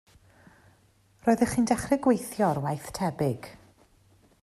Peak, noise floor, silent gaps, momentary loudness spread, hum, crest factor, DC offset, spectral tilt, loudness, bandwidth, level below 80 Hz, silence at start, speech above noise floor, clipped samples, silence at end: -10 dBFS; -63 dBFS; none; 8 LU; none; 20 dB; under 0.1%; -6 dB/octave; -27 LUFS; 14.5 kHz; -56 dBFS; 1.25 s; 37 dB; under 0.1%; 0.85 s